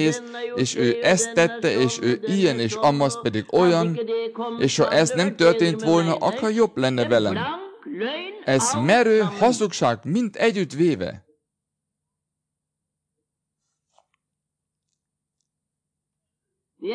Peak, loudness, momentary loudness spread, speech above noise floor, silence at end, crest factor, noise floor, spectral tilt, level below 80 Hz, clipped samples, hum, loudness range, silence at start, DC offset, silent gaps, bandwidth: -6 dBFS; -21 LUFS; 10 LU; 63 dB; 0 s; 16 dB; -83 dBFS; -4.5 dB/octave; -66 dBFS; under 0.1%; none; 6 LU; 0 s; under 0.1%; none; 10.5 kHz